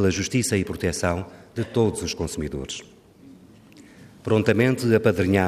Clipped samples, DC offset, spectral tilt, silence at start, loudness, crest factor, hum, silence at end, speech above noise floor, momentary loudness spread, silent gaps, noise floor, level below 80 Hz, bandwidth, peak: under 0.1%; under 0.1%; -5.5 dB/octave; 0 s; -23 LUFS; 18 dB; none; 0 s; 26 dB; 13 LU; none; -49 dBFS; -50 dBFS; 15.5 kHz; -6 dBFS